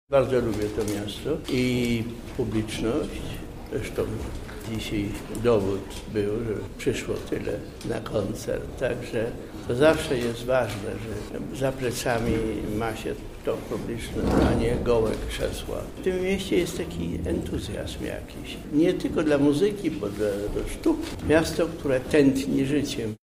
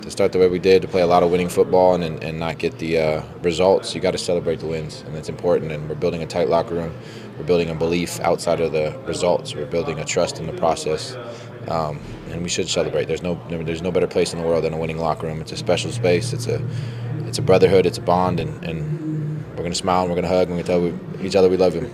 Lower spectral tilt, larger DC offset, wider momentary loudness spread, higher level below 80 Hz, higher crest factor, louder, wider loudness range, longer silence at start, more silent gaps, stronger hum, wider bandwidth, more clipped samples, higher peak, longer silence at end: about the same, -6 dB/octave vs -5.5 dB/octave; neither; about the same, 11 LU vs 11 LU; first, -40 dBFS vs -46 dBFS; about the same, 18 dB vs 20 dB; second, -27 LUFS vs -21 LUFS; about the same, 5 LU vs 5 LU; about the same, 0.1 s vs 0 s; neither; neither; about the same, 16 kHz vs 15 kHz; neither; second, -8 dBFS vs 0 dBFS; about the same, 0.05 s vs 0 s